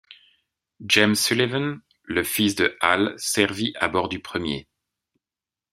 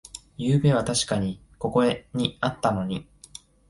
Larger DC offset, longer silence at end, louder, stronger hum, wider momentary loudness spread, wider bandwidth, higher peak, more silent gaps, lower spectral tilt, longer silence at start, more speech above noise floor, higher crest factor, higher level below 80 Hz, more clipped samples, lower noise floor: neither; first, 1.1 s vs 0.65 s; first, -22 LUFS vs -25 LUFS; neither; second, 12 LU vs 18 LU; first, 16 kHz vs 11.5 kHz; first, -2 dBFS vs -6 dBFS; neither; second, -3.5 dB/octave vs -5.5 dB/octave; about the same, 0.1 s vs 0.15 s; first, over 67 dB vs 24 dB; first, 24 dB vs 18 dB; second, -60 dBFS vs -52 dBFS; neither; first, under -90 dBFS vs -48 dBFS